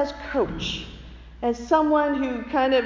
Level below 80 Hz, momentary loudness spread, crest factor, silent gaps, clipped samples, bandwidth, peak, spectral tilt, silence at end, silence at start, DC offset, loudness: -44 dBFS; 12 LU; 16 dB; none; under 0.1%; 7.6 kHz; -8 dBFS; -5 dB/octave; 0 s; 0 s; under 0.1%; -24 LUFS